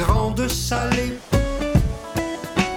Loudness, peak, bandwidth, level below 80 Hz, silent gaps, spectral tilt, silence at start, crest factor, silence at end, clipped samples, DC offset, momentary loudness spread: -22 LUFS; -6 dBFS; over 20 kHz; -28 dBFS; none; -5 dB/octave; 0 s; 16 dB; 0 s; under 0.1%; under 0.1%; 5 LU